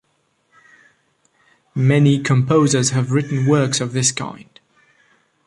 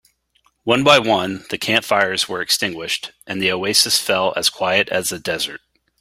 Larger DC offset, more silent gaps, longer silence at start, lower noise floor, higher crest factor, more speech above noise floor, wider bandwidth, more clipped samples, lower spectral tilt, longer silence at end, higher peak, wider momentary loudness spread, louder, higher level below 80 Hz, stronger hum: neither; neither; first, 1.75 s vs 0.65 s; about the same, -65 dBFS vs -62 dBFS; about the same, 16 dB vs 20 dB; first, 49 dB vs 44 dB; second, 11.5 kHz vs 16 kHz; neither; first, -5 dB/octave vs -2 dB/octave; first, 1.05 s vs 0.45 s; about the same, -2 dBFS vs 0 dBFS; second, 7 LU vs 11 LU; about the same, -17 LUFS vs -17 LUFS; about the same, -56 dBFS vs -58 dBFS; neither